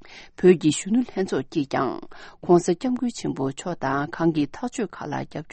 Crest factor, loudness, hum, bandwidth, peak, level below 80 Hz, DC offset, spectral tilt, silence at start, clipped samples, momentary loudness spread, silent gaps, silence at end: 20 dB; -24 LUFS; none; 8.8 kHz; -4 dBFS; -54 dBFS; under 0.1%; -6 dB/octave; 0.05 s; under 0.1%; 12 LU; none; 0 s